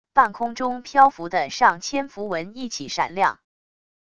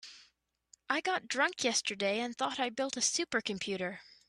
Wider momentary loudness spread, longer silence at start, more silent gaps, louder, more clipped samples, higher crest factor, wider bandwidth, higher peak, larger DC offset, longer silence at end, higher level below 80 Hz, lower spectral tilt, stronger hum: first, 11 LU vs 6 LU; about the same, 0.15 s vs 0.05 s; neither; first, -22 LUFS vs -33 LUFS; neither; about the same, 20 dB vs 20 dB; second, 10 kHz vs 14 kHz; first, -2 dBFS vs -16 dBFS; first, 0.5% vs under 0.1%; first, 0.8 s vs 0.25 s; first, -60 dBFS vs -76 dBFS; first, -3 dB/octave vs -1.5 dB/octave; neither